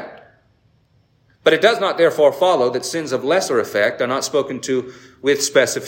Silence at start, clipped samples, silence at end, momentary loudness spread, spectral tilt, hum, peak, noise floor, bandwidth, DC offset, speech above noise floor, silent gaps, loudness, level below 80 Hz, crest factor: 0 s; under 0.1%; 0 s; 9 LU; -3 dB/octave; none; -2 dBFS; -58 dBFS; 16.5 kHz; under 0.1%; 41 dB; none; -18 LUFS; -66 dBFS; 18 dB